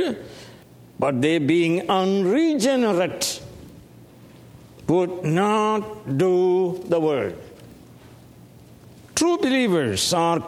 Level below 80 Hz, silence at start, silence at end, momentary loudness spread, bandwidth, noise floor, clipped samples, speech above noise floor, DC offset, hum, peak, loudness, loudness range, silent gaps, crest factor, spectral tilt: -58 dBFS; 0 s; 0 s; 11 LU; 15.5 kHz; -47 dBFS; under 0.1%; 26 dB; under 0.1%; none; -6 dBFS; -21 LUFS; 3 LU; none; 16 dB; -5 dB/octave